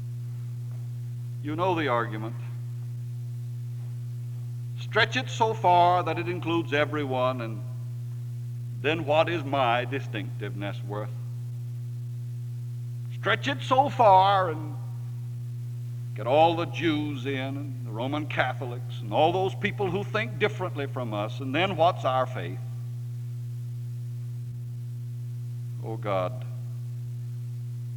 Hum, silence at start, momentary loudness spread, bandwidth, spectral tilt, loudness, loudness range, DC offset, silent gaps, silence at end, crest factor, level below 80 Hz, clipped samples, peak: 60 Hz at -35 dBFS; 0 s; 13 LU; 17 kHz; -6.5 dB/octave; -28 LUFS; 9 LU; under 0.1%; none; 0 s; 22 dB; -62 dBFS; under 0.1%; -6 dBFS